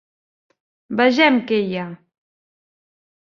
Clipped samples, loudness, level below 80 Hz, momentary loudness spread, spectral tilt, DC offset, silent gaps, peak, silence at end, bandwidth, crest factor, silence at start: under 0.1%; -18 LUFS; -70 dBFS; 14 LU; -5.5 dB/octave; under 0.1%; none; -2 dBFS; 1.3 s; 7.2 kHz; 20 dB; 0.9 s